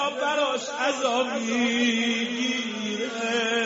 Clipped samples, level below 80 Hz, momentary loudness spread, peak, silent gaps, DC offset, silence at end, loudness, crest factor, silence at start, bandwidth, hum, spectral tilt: under 0.1%; -74 dBFS; 6 LU; -10 dBFS; none; under 0.1%; 0 s; -25 LUFS; 14 dB; 0 s; 8 kHz; none; -1 dB/octave